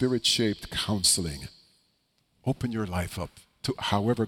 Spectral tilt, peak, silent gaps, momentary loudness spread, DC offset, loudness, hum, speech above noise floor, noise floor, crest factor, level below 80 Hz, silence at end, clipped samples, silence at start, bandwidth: -3.5 dB/octave; -10 dBFS; none; 15 LU; under 0.1%; -27 LUFS; none; 44 dB; -71 dBFS; 20 dB; -50 dBFS; 0 s; under 0.1%; 0 s; 17.5 kHz